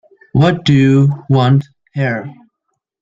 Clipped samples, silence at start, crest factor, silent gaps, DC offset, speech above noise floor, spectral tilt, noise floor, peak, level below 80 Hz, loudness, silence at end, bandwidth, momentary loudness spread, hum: under 0.1%; 0.35 s; 12 dB; none; under 0.1%; 61 dB; -8 dB/octave; -72 dBFS; -2 dBFS; -48 dBFS; -13 LUFS; 0.7 s; 7.6 kHz; 13 LU; none